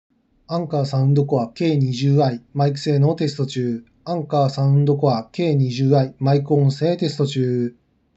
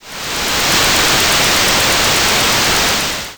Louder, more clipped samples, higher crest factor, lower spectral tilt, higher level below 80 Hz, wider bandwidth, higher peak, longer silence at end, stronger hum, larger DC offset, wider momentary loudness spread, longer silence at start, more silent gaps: second, -20 LUFS vs -11 LUFS; neither; first, 16 dB vs 8 dB; first, -8 dB/octave vs -1 dB/octave; second, -64 dBFS vs -32 dBFS; second, 7.8 kHz vs over 20 kHz; about the same, -4 dBFS vs -6 dBFS; first, 0.45 s vs 0 s; neither; neither; about the same, 7 LU vs 6 LU; first, 0.5 s vs 0.05 s; neither